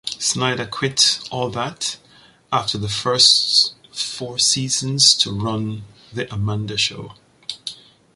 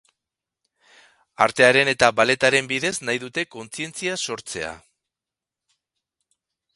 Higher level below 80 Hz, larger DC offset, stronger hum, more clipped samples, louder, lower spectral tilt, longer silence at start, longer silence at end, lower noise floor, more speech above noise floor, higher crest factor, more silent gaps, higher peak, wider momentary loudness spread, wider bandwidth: first, -52 dBFS vs -60 dBFS; neither; neither; neither; first, -17 LUFS vs -20 LUFS; about the same, -2 dB/octave vs -3 dB/octave; second, 0.05 s vs 1.4 s; second, 0.4 s vs 2 s; second, -51 dBFS vs -88 dBFS; second, 31 dB vs 67 dB; about the same, 22 dB vs 24 dB; neither; about the same, 0 dBFS vs 0 dBFS; first, 19 LU vs 15 LU; about the same, 11.5 kHz vs 11.5 kHz